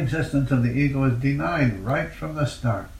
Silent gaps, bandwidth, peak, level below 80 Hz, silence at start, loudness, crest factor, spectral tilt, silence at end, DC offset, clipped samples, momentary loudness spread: none; 13.5 kHz; -10 dBFS; -40 dBFS; 0 s; -23 LUFS; 14 dB; -7.5 dB/octave; 0 s; under 0.1%; under 0.1%; 6 LU